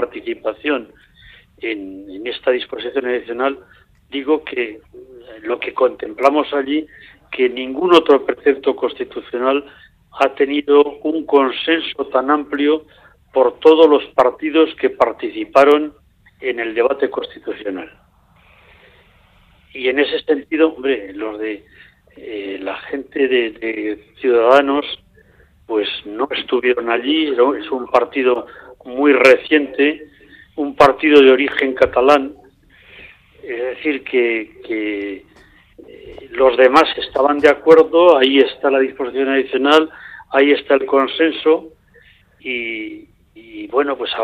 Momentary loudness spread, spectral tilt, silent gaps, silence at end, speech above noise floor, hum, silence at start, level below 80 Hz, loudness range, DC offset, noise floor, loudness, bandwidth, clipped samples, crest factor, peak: 16 LU; -4.5 dB/octave; none; 0 s; 36 dB; none; 0 s; -54 dBFS; 10 LU; under 0.1%; -52 dBFS; -16 LUFS; 10 kHz; under 0.1%; 16 dB; 0 dBFS